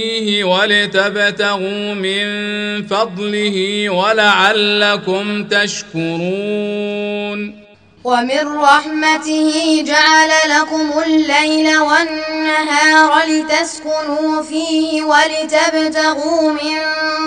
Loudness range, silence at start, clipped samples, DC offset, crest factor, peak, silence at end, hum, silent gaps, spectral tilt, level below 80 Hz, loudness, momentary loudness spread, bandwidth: 5 LU; 0 s; under 0.1%; 0.1%; 14 dB; 0 dBFS; 0 s; none; none; -3 dB/octave; -58 dBFS; -14 LUFS; 9 LU; 10.5 kHz